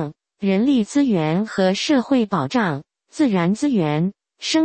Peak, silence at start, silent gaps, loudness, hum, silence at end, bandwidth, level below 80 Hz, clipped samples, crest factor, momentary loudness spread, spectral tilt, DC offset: -6 dBFS; 0 s; none; -20 LUFS; none; 0 s; 8.8 kHz; -60 dBFS; under 0.1%; 14 dB; 8 LU; -6 dB/octave; under 0.1%